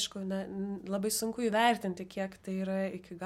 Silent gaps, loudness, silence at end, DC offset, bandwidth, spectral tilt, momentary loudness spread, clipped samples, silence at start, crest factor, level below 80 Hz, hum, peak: none; -33 LUFS; 0 s; under 0.1%; 16 kHz; -4 dB/octave; 11 LU; under 0.1%; 0 s; 20 dB; -68 dBFS; none; -14 dBFS